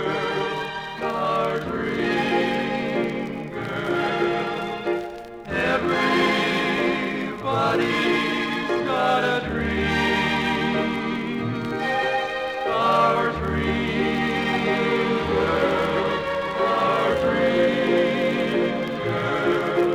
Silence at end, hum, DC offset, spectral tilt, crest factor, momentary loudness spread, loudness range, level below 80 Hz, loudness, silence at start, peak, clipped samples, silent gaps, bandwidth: 0 s; none; under 0.1%; -5.5 dB/octave; 16 dB; 7 LU; 3 LU; -46 dBFS; -23 LUFS; 0 s; -8 dBFS; under 0.1%; none; 15.5 kHz